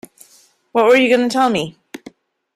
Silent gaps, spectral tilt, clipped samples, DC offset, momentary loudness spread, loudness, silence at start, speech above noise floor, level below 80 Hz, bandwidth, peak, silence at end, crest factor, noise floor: none; -4.5 dB/octave; under 0.1%; under 0.1%; 25 LU; -15 LUFS; 0.75 s; 38 dB; -60 dBFS; 14 kHz; -2 dBFS; 0.6 s; 16 dB; -52 dBFS